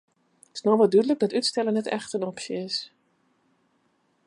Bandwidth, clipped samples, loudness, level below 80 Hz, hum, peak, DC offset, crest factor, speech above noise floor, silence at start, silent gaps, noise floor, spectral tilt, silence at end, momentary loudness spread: 11.5 kHz; under 0.1%; -25 LUFS; -78 dBFS; none; -8 dBFS; under 0.1%; 18 dB; 45 dB; 0.55 s; none; -69 dBFS; -4.5 dB/octave; 1.4 s; 12 LU